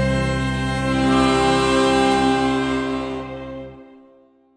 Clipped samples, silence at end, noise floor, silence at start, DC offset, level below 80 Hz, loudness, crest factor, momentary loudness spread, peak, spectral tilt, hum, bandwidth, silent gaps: under 0.1%; 0.7 s; -53 dBFS; 0 s; under 0.1%; -36 dBFS; -19 LUFS; 14 dB; 15 LU; -6 dBFS; -5.5 dB/octave; none; 10 kHz; none